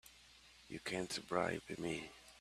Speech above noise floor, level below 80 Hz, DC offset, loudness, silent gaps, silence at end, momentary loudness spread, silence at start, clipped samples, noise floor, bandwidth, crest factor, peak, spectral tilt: 22 dB; -70 dBFS; under 0.1%; -42 LUFS; none; 0 s; 22 LU; 0.05 s; under 0.1%; -64 dBFS; 14 kHz; 24 dB; -20 dBFS; -4 dB/octave